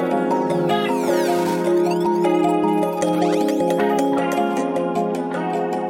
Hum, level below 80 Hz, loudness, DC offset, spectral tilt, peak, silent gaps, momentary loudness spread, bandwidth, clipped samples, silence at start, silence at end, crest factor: none; -64 dBFS; -20 LUFS; under 0.1%; -6 dB/octave; -6 dBFS; none; 4 LU; 17 kHz; under 0.1%; 0 s; 0 s; 12 dB